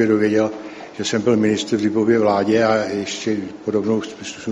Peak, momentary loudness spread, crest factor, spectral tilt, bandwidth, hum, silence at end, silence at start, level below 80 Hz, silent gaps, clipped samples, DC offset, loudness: -4 dBFS; 10 LU; 16 dB; -5 dB/octave; 10.5 kHz; none; 0 s; 0 s; -58 dBFS; none; under 0.1%; under 0.1%; -19 LUFS